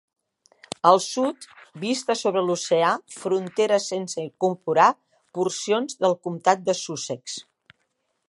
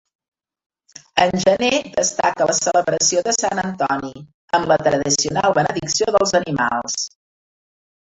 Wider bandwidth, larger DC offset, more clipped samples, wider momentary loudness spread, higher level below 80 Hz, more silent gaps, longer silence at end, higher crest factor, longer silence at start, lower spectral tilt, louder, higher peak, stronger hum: first, 11.5 kHz vs 8.4 kHz; neither; neither; first, 14 LU vs 6 LU; second, -78 dBFS vs -52 dBFS; second, none vs 4.34-4.48 s; second, 0.85 s vs 1 s; about the same, 22 dB vs 18 dB; second, 0.85 s vs 1.15 s; first, -4 dB/octave vs -2.5 dB/octave; second, -23 LUFS vs -18 LUFS; about the same, -2 dBFS vs -2 dBFS; neither